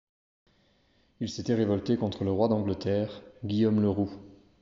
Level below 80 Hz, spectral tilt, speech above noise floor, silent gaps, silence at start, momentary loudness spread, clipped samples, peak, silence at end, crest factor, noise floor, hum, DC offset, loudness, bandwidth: -62 dBFS; -7.5 dB/octave; 39 dB; none; 1.2 s; 11 LU; under 0.1%; -12 dBFS; 0.25 s; 18 dB; -67 dBFS; none; under 0.1%; -29 LUFS; 7.6 kHz